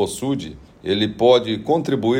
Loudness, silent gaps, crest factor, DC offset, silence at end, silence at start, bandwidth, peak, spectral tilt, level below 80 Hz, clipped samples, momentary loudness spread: -19 LUFS; none; 16 dB; under 0.1%; 0 s; 0 s; 16 kHz; -4 dBFS; -5.5 dB/octave; -50 dBFS; under 0.1%; 13 LU